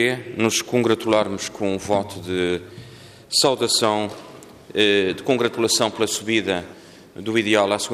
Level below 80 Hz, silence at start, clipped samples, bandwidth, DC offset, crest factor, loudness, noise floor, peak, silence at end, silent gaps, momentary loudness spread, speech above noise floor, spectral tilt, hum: -60 dBFS; 0 s; under 0.1%; 15.5 kHz; under 0.1%; 16 dB; -21 LUFS; -43 dBFS; -4 dBFS; 0 s; none; 11 LU; 22 dB; -3 dB/octave; none